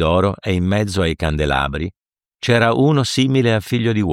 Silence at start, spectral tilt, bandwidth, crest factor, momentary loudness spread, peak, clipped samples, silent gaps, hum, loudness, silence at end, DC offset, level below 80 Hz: 0 s; -6 dB/octave; 15.5 kHz; 14 dB; 7 LU; -2 dBFS; under 0.1%; none; none; -17 LUFS; 0 s; under 0.1%; -34 dBFS